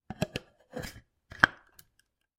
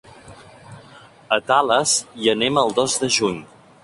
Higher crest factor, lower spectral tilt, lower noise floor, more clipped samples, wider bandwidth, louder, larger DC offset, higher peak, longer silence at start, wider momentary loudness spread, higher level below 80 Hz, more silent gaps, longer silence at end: first, 34 dB vs 20 dB; first, -4 dB/octave vs -2.5 dB/octave; first, -73 dBFS vs -46 dBFS; neither; first, 16 kHz vs 11.5 kHz; second, -30 LUFS vs -19 LUFS; neither; about the same, -2 dBFS vs -2 dBFS; second, 0.1 s vs 0.25 s; first, 18 LU vs 6 LU; about the same, -56 dBFS vs -58 dBFS; neither; first, 0.85 s vs 0.4 s